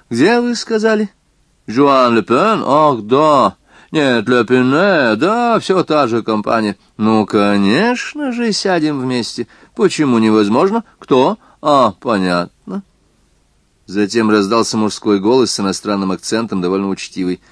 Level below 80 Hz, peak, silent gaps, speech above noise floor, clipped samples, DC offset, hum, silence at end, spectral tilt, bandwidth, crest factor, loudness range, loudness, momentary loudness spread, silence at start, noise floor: -56 dBFS; 0 dBFS; none; 43 dB; under 0.1%; under 0.1%; none; 0.15 s; -5 dB/octave; 11 kHz; 14 dB; 4 LU; -14 LUFS; 9 LU; 0.1 s; -56 dBFS